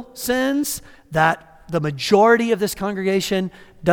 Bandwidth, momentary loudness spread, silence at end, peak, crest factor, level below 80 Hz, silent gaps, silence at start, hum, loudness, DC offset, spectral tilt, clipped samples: 18.5 kHz; 12 LU; 0 s; -2 dBFS; 18 dB; -50 dBFS; none; 0 s; none; -20 LUFS; under 0.1%; -4.5 dB/octave; under 0.1%